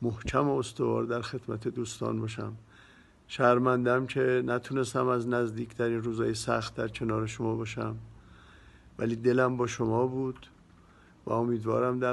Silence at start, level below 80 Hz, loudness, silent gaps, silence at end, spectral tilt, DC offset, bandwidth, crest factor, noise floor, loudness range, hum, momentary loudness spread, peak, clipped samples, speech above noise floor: 0 s; -56 dBFS; -30 LUFS; none; 0 s; -6.5 dB/octave; under 0.1%; 12 kHz; 22 dB; -57 dBFS; 4 LU; none; 11 LU; -8 dBFS; under 0.1%; 28 dB